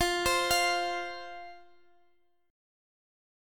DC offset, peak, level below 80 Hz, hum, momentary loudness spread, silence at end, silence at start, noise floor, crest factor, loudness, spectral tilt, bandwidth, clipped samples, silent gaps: under 0.1%; -14 dBFS; -54 dBFS; none; 20 LU; 1.9 s; 0 s; -71 dBFS; 20 dB; -28 LUFS; -1.5 dB/octave; 17.5 kHz; under 0.1%; none